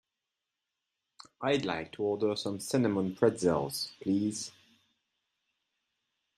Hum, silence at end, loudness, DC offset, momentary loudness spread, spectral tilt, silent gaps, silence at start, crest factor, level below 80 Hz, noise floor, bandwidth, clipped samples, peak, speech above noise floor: none; 1.9 s; -31 LUFS; under 0.1%; 8 LU; -5 dB/octave; none; 1.4 s; 22 dB; -70 dBFS; -88 dBFS; 15 kHz; under 0.1%; -12 dBFS; 57 dB